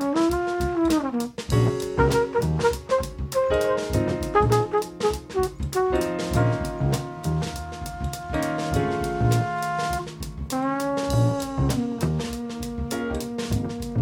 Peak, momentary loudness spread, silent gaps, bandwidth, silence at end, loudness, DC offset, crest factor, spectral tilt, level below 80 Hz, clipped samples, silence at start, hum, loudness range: -6 dBFS; 7 LU; none; 17.5 kHz; 0 s; -25 LUFS; under 0.1%; 18 dB; -6.5 dB/octave; -36 dBFS; under 0.1%; 0 s; none; 3 LU